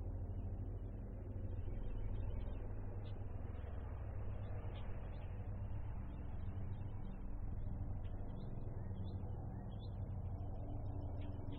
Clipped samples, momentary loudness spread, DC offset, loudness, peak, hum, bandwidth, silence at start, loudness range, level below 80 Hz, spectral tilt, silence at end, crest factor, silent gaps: under 0.1%; 3 LU; under 0.1%; -48 LUFS; -32 dBFS; none; 4.2 kHz; 0 s; 1 LU; -48 dBFS; -9 dB/octave; 0 s; 12 dB; none